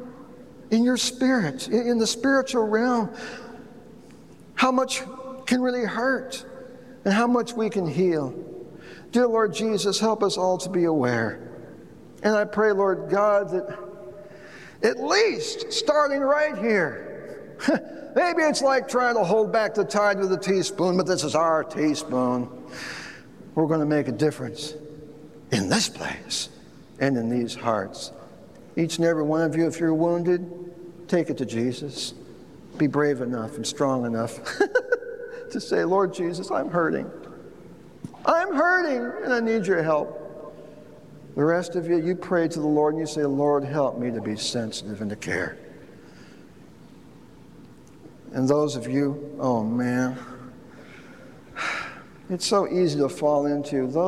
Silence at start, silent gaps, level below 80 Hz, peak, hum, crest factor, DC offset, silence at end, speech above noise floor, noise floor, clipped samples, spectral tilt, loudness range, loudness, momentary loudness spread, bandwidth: 0 s; none; -64 dBFS; -8 dBFS; none; 18 dB; 0.2%; 0 s; 25 dB; -48 dBFS; under 0.1%; -5 dB/octave; 5 LU; -24 LUFS; 19 LU; 14 kHz